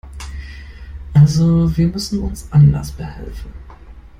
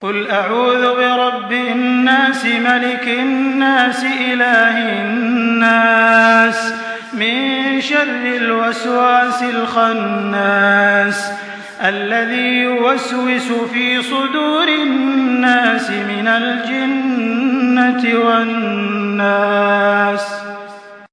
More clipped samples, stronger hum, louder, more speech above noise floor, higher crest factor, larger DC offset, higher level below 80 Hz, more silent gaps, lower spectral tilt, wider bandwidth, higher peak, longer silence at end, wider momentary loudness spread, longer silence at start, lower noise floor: neither; neither; about the same, -15 LUFS vs -14 LUFS; about the same, 22 dB vs 21 dB; about the same, 14 dB vs 14 dB; neither; first, -30 dBFS vs -68 dBFS; neither; first, -7.5 dB/octave vs -4.5 dB/octave; first, 15 kHz vs 10.5 kHz; about the same, -2 dBFS vs 0 dBFS; first, 0.2 s vs 0.05 s; first, 23 LU vs 7 LU; about the same, 0.05 s vs 0 s; about the same, -38 dBFS vs -35 dBFS